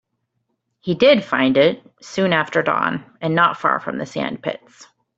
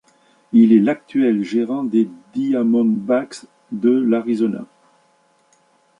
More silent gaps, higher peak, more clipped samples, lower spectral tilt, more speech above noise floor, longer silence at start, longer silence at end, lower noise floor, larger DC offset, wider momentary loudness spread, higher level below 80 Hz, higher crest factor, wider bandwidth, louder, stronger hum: neither; about the same, -2 dBFS vs -2 dBFS; neither; second, -6 dB/octave vs -7.5 dB/octave; first, 54 dB vs 42 dB; first, 0.85 s vs 0.55 s; second, 0.35 s vs 1.35 s; first, -73 dBFS vs -59 dBFS; neither; first, 14 LU vs 11 LU; first, -60 dBFS vs -68 dBFS; about the same, 18 dB vs 16 dB; second, 8 kHz vs 9.8 kHz; about the same, -18 LUFS vs -18 LUFS; neither